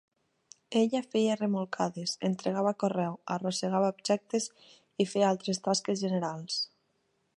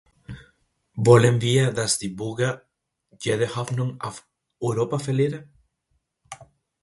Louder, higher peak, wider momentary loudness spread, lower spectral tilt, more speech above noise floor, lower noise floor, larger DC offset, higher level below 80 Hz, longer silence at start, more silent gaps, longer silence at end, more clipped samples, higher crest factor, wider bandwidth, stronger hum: second, -31 LUFS vs -22 LUFS; second, -12 dBFS vs 0 dBFS; second, 6 LU vs 26 LU; about the same, -5 dB/octave vs -5.5 dB/octave; second, 45 dB vs 51 dB; about the same, -75 dBFS vs -73 dBFS; neither; second, -80 dBFS vs -56 dBFS; first, 0.7 s vs 0.3 s; neither; first, 0.7 s vs 0.5 s; neither; second, 18 dB vs 24 dB; about the same, 11.5 kHz vs 11.5 kHz; neither